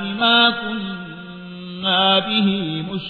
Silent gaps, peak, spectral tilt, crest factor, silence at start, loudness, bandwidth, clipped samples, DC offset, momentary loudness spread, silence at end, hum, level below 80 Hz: none; -4 dBFS; -7 dB/octave; 16 dB; 0 s; -17 LUFS; 4.8 kHz; under 0.1%; under 0.1%; 20 LU; 0 s; none; -56 dBFS